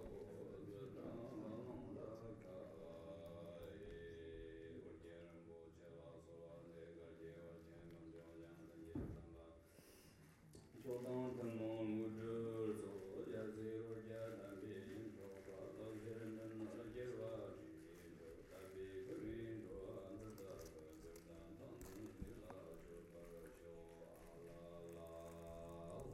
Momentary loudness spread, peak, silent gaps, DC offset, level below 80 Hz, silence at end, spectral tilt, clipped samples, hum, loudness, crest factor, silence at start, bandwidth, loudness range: 13 LU; -36 dBFS; none; under 0.1%; -70 dBFS; 0 s; -7 dB/octave; under 0.1%; none; -54 LUFS; 18 dB; 0 s; 16 kHz; 10 LU